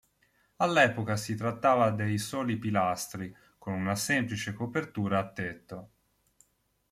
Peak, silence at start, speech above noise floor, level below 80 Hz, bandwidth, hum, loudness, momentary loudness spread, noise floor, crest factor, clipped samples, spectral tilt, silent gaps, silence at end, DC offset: -10 dBFS; 0.6 s; 43 dB; -66 dBFS; 15.5 kHz; none; -29 LUFS; 15 LU; -73 dBFS; 22 dB; under 0.1%; -5 dB/octave; none; 1.05 s; under 0.1%